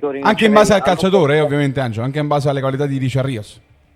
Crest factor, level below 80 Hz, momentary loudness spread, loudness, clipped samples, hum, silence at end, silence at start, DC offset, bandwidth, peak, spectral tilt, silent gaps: 16 dB; -46 dBFS; 9 LU; -15 LUFS; under 0.1%; none; 0.4 s; 0 s; under 0.1%; 14 kHz; 0 dBFS; -6 dB/octave; none